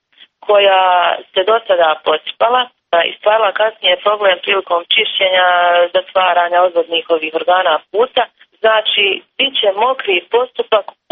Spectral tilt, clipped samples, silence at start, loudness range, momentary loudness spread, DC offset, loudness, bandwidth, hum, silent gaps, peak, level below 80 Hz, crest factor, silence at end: 2.5 dB/octave; under 0.1%; 0.45 s; 2 LU; 6 LU; under 0.1%; -13 LUFS; 4.5 kHz; none; none; -2 dBFS; -64 dBFS; 12 dB; 0.3 s